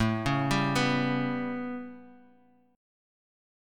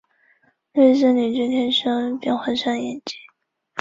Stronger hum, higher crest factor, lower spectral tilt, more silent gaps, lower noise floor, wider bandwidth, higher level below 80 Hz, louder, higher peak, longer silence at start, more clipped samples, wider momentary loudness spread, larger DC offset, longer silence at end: neither; about the same, 18 dB vs 18 dB; about the same, -5.5 dB/octave vs -4.5 dB/octave; neither; about the same, -62 dBFS vs -63 dBFS; first, 16.5 kHz vs 7.8 kHz; first, -52 dBFS vs -64 dBFS; second, -28 LUFS vs -20 LUFS; second, -12 dBFS vs -4 dBFS; second, 0 s vs 0.75 s; neither; second, 12 LU vs 17 LU; neither; first, 1.6 s vs 0 s